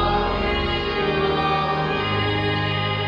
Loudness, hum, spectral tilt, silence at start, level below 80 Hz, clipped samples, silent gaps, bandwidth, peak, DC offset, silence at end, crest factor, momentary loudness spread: -22 LUFS; none; -7 dB/octave; 0 s; -34 dBFS; under 0.1%; none; 8.2 kHz; -8 dBFS; under 0.1%; 0 s; 14 dB; 1 LU